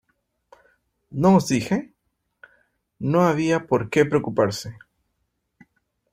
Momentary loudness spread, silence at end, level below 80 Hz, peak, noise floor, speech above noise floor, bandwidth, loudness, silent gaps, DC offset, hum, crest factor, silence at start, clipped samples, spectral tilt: 13 LU; 1.4 s; -58 dBFS; -4 dBFS; -75 dBFS; 54 dB; 15.5 kHz; -21 LUFS; none; under 0.1%; none; 20 dB; 1.1 s; under 0.1%; -6.5 dB/octave